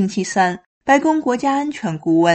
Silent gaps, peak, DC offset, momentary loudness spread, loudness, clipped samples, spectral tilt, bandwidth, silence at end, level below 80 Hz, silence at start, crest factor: 0.66-0.81 s; -2 dBFS; under 0.1%; 9 LU; -18 LUFS; under 0.1%; -5 dB/octave; 8.8 kHz; 0 s; -58 dBFS; 0 s; 16 dB